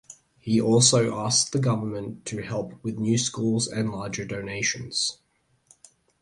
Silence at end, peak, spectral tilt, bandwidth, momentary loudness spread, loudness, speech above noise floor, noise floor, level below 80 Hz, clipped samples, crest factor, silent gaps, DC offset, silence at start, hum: 1.05 s; -6 dBFS; -4 dB/octave; 11.5 kHz; 14 LU; -24 LUFS; 36 dB; -61 dBFS; -58 dBFS; under 0.1%; 20 dB; none; under 0.1%; 0.1 s; none